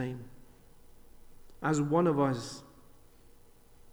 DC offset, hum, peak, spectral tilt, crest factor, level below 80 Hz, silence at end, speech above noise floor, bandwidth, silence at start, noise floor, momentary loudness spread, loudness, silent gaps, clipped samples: under 0.1%; none; -16 dBFS; -6.5 dB/octave; 20 dB; -58 dBFS; 0 s; 27 dB; over 20 kHz; 0 s; -56 dBFS; 20 LU; -30 LUFS; none; under 0.1%